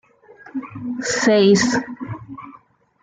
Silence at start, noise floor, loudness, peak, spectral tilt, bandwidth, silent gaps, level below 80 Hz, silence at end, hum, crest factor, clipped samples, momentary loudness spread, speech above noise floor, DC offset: 0.45 s; -51 dBFS; -17 LUFS; -4 dBFS; -4.5 dB/octave; 9.6 kHz; none; -56 dBFS; 0.5 s; none; 16 dB; under 0.1%; 20 LU; 33 dB; under 0.1%